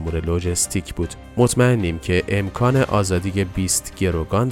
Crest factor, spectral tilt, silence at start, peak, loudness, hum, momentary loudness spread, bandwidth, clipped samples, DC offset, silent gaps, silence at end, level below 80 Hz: 16 dB; -5 dB/octave; 0 s; -2 dBFS; -20 LUFS; none; 6 LU; 17 kHz; under 0.1%; under 0.1%; none; 0 s; -36 dBFS